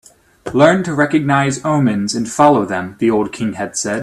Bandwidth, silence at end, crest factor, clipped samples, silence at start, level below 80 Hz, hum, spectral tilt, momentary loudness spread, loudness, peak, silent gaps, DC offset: 13 kHz; 0 s; 16 dB; under 0.1%; 0.45 s; -52 dBFS; none; -5.5 dB/octave; 9 LU; -15 LUFS; 0 dBFS; none; under 0.1%